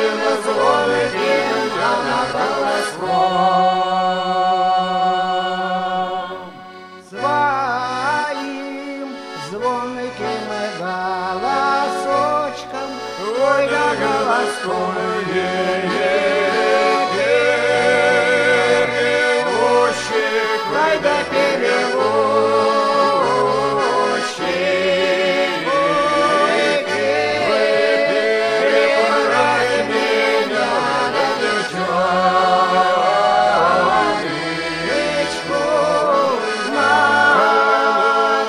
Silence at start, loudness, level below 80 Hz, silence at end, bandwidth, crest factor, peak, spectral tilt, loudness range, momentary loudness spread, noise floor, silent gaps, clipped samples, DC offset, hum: 0 s; -17 LUFS; -56 dBFS; 0 s; 13.5 kHz; 16 dB; -2 dBFS; -3.5 dB/octave; 6 LU; 9 LU; -37 dBFS; none; under 0.1%; under 0.1%; none